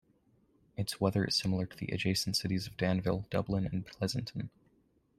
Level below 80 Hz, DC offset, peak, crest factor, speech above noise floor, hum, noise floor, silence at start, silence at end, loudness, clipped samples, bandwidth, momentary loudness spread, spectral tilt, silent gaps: -58 dBFS; under 0.1%; -14 dBFS; 20 dB; 37 dB; none; -71 dBFS; 0.8 s; 0.7 s; -34 LUFS; under 0.1%; 14 kHz; 9 LU; -5 dB/octave; none